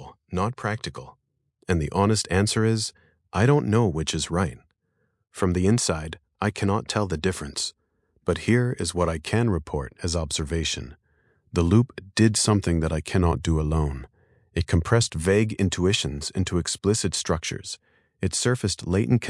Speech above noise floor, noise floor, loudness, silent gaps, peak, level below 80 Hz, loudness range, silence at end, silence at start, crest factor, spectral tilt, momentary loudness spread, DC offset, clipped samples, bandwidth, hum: 49 dB; -72 dBFS; -24 LUFS; none; -4 dBFS; -42 dBFS; 3 LU; 0 s; 0 s; 20 dB; -5 dB/octave; 10 LU; under 0.1%; under 0.1%; 12 kHz; none